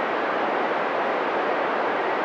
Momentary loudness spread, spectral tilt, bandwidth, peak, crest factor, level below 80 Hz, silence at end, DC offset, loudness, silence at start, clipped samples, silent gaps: 0 LU; -5 dB/octave; 8.8 kHz; -12 dBFS; 12 dB; -76 dBFS; 0 s; under 0.1%; -24 LUFS; 0 s; under 0.1%; none